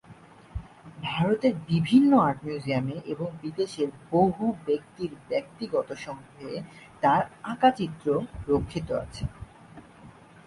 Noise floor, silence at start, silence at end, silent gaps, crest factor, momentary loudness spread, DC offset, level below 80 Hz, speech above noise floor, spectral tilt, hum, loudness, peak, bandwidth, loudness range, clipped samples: -51 dBFS; 0.1 s; 0.35 s; none; 20 dB; 16 LU; under 0.1%; -50 dBFS; 24 dB; -7.5 dB/octave; none; -27 LUFS; -8 dBFS; 11.5 kHz; 4 LU; under 0.1%